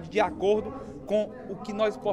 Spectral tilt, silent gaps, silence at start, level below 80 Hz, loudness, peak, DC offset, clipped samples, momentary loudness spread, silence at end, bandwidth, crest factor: -6 dB/octave; none; 0 s; -54 dBFS; -29 LUFS; -12 dBFS; under 0.1%; under 0.1%; 13 LU; 0 s; 11 kHz; 16 dB